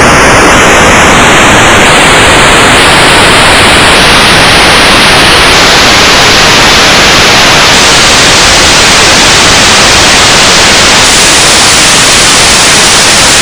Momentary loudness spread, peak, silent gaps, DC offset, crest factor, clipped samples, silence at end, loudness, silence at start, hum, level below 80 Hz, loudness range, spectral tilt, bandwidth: 1 LU; 0 dBFS; none; under 0.1%; 2 dB; 30%; 0 s; 0 LUFS; 0 s; none; -20 dBFS; 0 LU; -1.5 dB/octave; 12 kHz